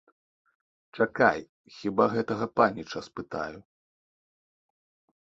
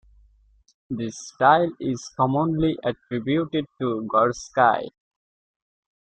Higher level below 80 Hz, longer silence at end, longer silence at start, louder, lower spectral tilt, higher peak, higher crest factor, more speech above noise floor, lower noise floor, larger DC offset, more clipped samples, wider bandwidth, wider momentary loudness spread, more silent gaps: second, -64 dBFS vs -54 dBFS; first, 1.6 s vs 1.3 s; about the same, 0.95 s vs 0.9 s; second, -28 LUFS vs -23 LUFS; about the same, -6.5 dB/octave vs -6 dB/octave; about the same, -6 dBFS vs -4 dBFS; about the same, 24 dB vs 20 dB; first, over 62 dB vs 36 dB; first, under -90 dBFS vs -59 dBFS; neither; neither; second, 7.8 kHz vs 9 kHz; about the same, 14 LU vs 12 LU; first, 1.49-1.64 s vs none